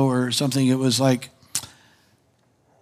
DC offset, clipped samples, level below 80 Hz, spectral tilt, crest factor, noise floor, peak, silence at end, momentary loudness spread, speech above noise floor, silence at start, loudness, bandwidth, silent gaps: under 0.1%; under 0.1%; -70 dBFS; -5 dB/octave; 18 dB; -63 dBFS; -6 dBFS; 1.15 s; 10 LU; 43 dB; 0 s; -22 LUFS; 16 kHz; none